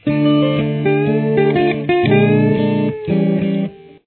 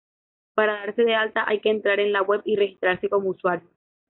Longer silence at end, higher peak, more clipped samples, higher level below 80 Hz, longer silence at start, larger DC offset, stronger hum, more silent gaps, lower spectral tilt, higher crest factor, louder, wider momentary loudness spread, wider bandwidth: second, 0.3 s vs 0.5 s; first, -2 dBFS vs -8 dBFS; neither; first, -50 dBFS vs -70 dBFS; second, 0.05 s vs 0.55 s; neither; neither; neither; first, -11.5 dB/octave vs -2 dB/octave; about the same, 14 dB vs 16 dB; first, -15 LUFS vs -23 LUFS; about the same, 6 LU vs 5 LU; about the same, 4.4 kHz vs 4.1 kHz